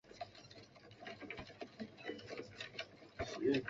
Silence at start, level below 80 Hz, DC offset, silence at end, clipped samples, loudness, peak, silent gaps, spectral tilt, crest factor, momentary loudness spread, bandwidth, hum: 0.05 s; -68 dBFS; under 0.1%; 0 s; under 0.1%; -47 LUFS; -24 dBFS; none; -4 dB/octave; 22 dB; 13 LU; 7.6 kHz; none